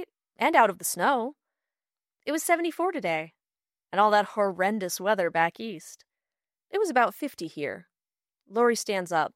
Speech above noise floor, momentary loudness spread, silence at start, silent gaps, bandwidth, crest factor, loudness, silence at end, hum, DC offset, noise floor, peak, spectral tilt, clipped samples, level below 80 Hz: over 64 dB; 15 LU; 0 s; none; 16 kHz; 22 dB; -26 LUFS; 0.05 s; none; under 0.1%; under -90 dBFS; -6 dBFS; -3.5 dB/octave; under 0.1%; -80 dBFS